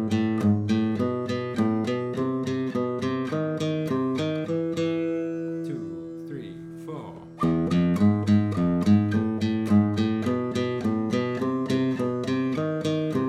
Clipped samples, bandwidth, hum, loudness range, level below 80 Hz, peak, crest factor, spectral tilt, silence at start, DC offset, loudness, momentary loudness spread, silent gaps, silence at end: under 0.1%; 11 kHz; none; 6 LU; -58 dBFS; -8 dBFS; 16 dB; -7.5 dB/octave; 0 s; under 0.1%; -25 LUFS; 13 LU; none; 0 s